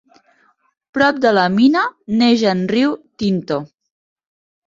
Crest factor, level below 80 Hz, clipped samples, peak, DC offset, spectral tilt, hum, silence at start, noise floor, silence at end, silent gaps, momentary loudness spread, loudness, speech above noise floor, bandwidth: 16 dB; -58 dBFS; under 0.1%; -2 dBFS; under 0.1%; -6 dB/octave; none; 0.95 s; -58 dBFS; 1 s; none; 9 LU; -16 LUFS; 42 dB; 7.6 kHz